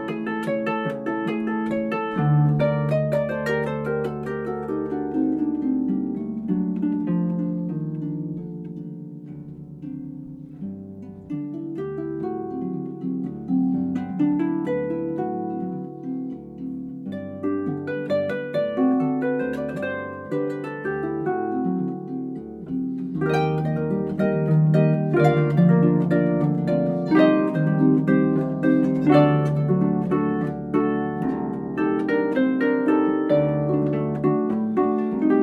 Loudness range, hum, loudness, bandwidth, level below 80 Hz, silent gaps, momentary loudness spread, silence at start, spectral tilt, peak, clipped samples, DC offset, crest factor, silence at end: 11 LU; none; -23 LUFS; 6.8 kHz; -54 dBFS; none; 14 LU; 0 s; -9.5 dB/octave; -4 dBFS; under 0.1%; under 0.1%; 18 dB; 0 s